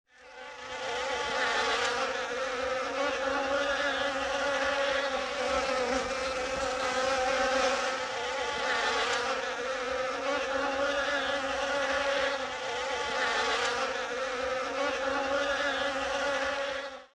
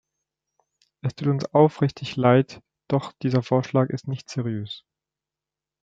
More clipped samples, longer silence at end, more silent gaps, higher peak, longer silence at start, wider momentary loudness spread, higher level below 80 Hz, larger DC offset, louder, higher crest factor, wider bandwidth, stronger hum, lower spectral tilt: neither; second, 0.1 s vs 1.05 s; neither; second, -16 dBFS vs -4 dBFS; second, 0.2 s vs 1.05 s; second, 5 LU vs 13 LU; first, -56 dBFS vs -66 dBFS; neither; second, -30 LUFS vs -24 LUFS; second, 16 dB vs 22 dB; first, 12 kHz vs 7.8 kHz; neither; second, -1.5 dB/octave vs -7.5 dB/octave